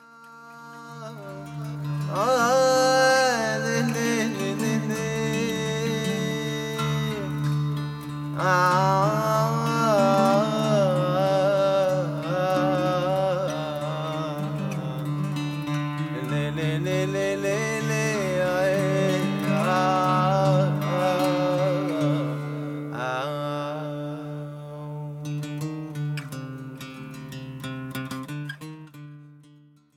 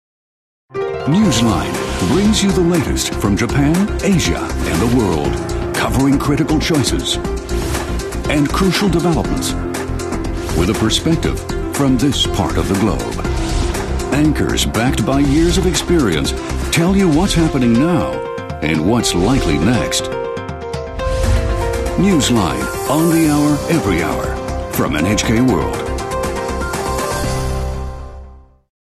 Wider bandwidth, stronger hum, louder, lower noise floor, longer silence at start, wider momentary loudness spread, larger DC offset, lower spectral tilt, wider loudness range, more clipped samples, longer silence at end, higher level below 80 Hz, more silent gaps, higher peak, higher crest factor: first, 16 kHz vs 13.5 kHz; neither; second, -24 LUFS vs -16 LUFS; first, -54 dBFS vs -38 dBFS; second, 0.1 s vs 0.7 s; first, 16 LU vs 8 LU; neither; about the same, -5.5 dB/octave vs -5 dB/octave; first, 12 LU vs 3 LU; neither; about the same, 0.6 s vs 0.55 s; second, -58 dBFS vs -26 dBFS; neither; second, -6 dBFS vs -2 dBFS; about the same, 18 dB vs 14 dB